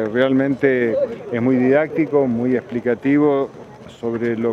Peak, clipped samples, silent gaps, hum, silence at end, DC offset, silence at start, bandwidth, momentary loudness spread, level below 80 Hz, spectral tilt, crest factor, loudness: -2 dBFS; under 0.1%; none; none; 0 s; under 0.1%; 0 s; 7 kHz; 7 LU; -58 dBFS; -8.5 dB/octave; 16 dB; -18 LUFS